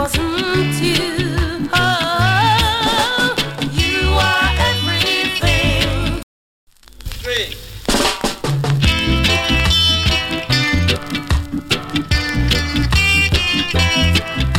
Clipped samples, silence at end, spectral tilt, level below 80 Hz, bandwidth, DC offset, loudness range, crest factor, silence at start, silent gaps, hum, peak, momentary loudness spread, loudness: under 0.1%; 0 s; -4 dB/octave; -24 dBFS; 17 kHz; under 0.1%; 4 LU; 14 dB; 0 s; 6.23-6.67 s; none; -2 dBFS; 7 LU; -15 LUFS